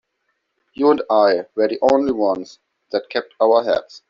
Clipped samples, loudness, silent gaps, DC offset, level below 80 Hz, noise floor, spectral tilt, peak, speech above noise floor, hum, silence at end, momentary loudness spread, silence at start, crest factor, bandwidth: under 0.1%; -18 LUFS; none; under 0.1%; -60 dBFS; -72 dBFS; -3 dB/octave; -2 dBFS; 54 dB; none; 0.1 s; 11 LU; 0.8 s; 16 dB; 7.4 kHz